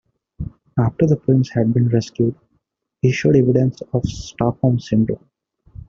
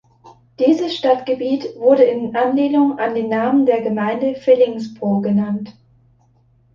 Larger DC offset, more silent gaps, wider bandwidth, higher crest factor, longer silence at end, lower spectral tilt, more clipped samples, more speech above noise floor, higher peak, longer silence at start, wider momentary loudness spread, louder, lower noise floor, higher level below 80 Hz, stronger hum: neither; neither; about the same, 7.4 kHz vs 7.2 kHz; about the same, 16 dB vs 16 dB; second, 0.7 s vs 1.05 s; about the same, -8 dB/octave vs -7.5 dB/octave; neither; first, 52 dB vs 39 dB; about the same, -2 dBFS vs -2 dBFS; first, 0.4 s vs 0.25 s; first, 11 LU vs 7 LU; about the same, -18 LUFS vs -17 LUFS; first, -69 dBFS vs -55 dBFS; first, -44 dBFS vs -62 dBFS; neither